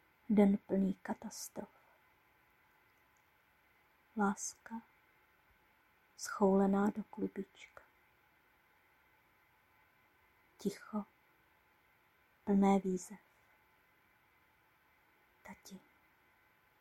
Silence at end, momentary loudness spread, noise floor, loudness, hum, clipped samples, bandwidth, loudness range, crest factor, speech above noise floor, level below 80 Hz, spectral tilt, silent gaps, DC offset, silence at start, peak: 1.05 s; 26 LU; -72 dBFS; -36 LUFS; none; under 0.1%; 14 kHz; 13 LU; 24 dB; 37 dB; -72 dBFS; -6.5 dB/octave; none; under 0.1%; 0.3 s; -16 dBFS